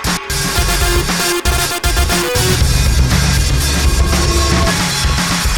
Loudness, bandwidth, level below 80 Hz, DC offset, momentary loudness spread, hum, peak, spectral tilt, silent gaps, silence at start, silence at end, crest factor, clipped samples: -14 LUFS; 19.5 kHz; -16 dBFS; under 0.1%; 2 LU; none; 0 dBFS; -3.5 dB/octave; none; 0 s; 0 s; 12 dB; under 0.1%